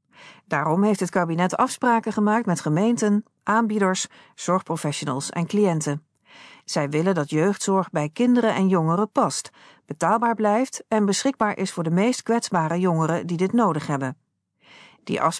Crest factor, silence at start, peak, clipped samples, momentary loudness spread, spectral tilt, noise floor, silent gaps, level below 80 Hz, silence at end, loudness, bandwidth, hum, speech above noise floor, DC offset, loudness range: 16 dB; 0.2 s; -6 dBFS; under 0.1%; 7 LU; -5.5 dB/octave; -59 dBFS; none; -70 dBFS; 0 s; -23 LUFS; 11 kHz; none; 37 dB; under 0.1%; 3 LU